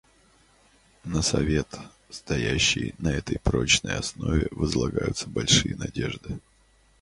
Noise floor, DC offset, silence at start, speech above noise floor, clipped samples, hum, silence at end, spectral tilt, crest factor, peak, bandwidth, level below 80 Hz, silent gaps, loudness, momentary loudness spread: -61 dBFS; under 0.1%; 1.05 s; 35 dB; under 0.1%; none; 0.6 s; -3.5 dB/octave; 22 dB; -4 dBFS; 11.5 kHz; -38 dBFS; none; -25 LUFS; 17 LU